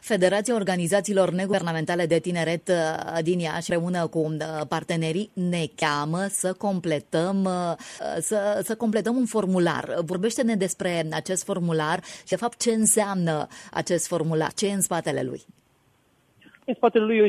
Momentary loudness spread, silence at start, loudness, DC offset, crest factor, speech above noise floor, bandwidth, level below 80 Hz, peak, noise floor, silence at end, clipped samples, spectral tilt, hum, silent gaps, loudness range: 7 LU; 0.05 s; -25 LUFS; under 0.1%; 18 dB; 39 dB; 14 kHz; -66 dBFS; -6 dBFS; -64 dBFS; 0 s; under 0.1%; -4.5 dB/octave; none; none; 2 LU